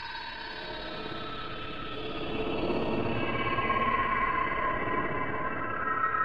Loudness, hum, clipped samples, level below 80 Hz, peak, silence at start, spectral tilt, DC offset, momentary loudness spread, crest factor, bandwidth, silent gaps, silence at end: -31 LUFS; none; under 0.1%; -48 dBFS; -16 dBFS; 0 s; -7 dB/octave; 1%; 10 LU; 16 dB; 7 kHz; none; 0 s